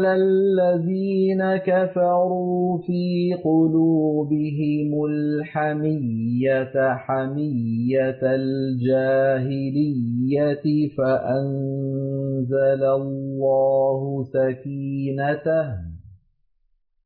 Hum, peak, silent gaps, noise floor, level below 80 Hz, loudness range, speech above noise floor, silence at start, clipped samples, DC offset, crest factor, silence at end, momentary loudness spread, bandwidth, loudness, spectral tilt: none; -10 dBFS; none; -65 dBFS; -58 dBFS; 2 LU; 45 dB; 0 s; under 0.1%; under 0.1%; 10 dB; 0.9 s; 7 LU; 4.7 kHz; -22 LUFS; -12 dB/octave